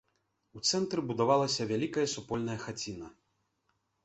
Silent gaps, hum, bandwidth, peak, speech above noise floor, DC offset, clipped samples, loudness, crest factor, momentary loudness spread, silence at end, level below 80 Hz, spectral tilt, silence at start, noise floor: none; none; 8.4 kHz; -12 dBFS; 46 dB; under 0.1%; under 0.1%; -32 LUFS; 20 dB; 12 LU; 0.95 s; -66 dBFS; -4 dB/octave; 0.55 s; -78 dBFS